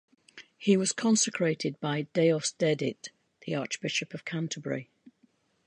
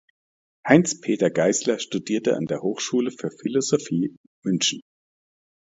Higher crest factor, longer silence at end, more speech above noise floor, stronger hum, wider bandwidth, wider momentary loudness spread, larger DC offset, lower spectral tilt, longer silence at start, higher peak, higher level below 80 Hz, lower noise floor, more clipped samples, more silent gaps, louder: second, 18 dB vs 24 dB; about the same, 0.85 s vs 0.85 s; second, 39 dB vs over 68 dB; neither; first, 11 kHz vs 8 kHz; about the same, 11 LU vs 11 LU; neither; about the same, -4 dB/octave vs -4 dB/octave; second, 0.35 s vs 0.65 s; second, -12 dBFS vs 0 dBFS; second, -78 dBFS vs -68 dBFS; second, -68 dBFS vs under -90 dBFS; neither; second, none vs 4.17-4.42 s; second, -29 LUFS vs -23 LUFS